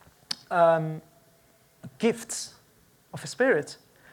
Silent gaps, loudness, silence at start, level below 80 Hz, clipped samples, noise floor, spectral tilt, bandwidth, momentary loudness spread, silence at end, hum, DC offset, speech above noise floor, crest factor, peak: none; -26 LUFS; 0.3 s; -72 dBFS; under 0.1%; -61 dBFS; -4.5 dB/octave; 19 kHz; 19 LU; 0.4 s; none; under 0.1%; 36 dB; 18 dB; -10 dBFS